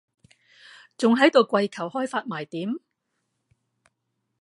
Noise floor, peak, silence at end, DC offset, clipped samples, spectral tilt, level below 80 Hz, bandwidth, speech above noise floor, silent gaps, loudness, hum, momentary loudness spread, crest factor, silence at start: -78 dBFS; -2 dBFS; 1.65 s; under 0.1%; under 0.1%; -5 dB/octave; -80 dBFS; 11.5 kHz; 55 dB; none; -23 LUFS; none; 14 LU; 24 dB; 1 s